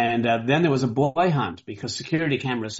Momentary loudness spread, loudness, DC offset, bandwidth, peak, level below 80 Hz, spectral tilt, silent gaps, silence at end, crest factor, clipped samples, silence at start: 10 LU; -23 LUFS; under 0.1%; 8 kHz; -8 dBFS; -60 dBFS; -5 dB/octave; none; 0 s; 16 dB; under 0.1%; 0 s